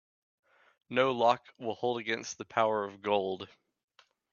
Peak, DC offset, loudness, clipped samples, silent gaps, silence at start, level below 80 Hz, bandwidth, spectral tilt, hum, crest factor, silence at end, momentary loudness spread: -10 dBFS; under 0.1%; -31 LUFS; under 0.1%; none; 0.9 s; -78 dBFS; 7.2 kHz; -4 dB/octave; none; 22 dB; 0.85 s; 11 LU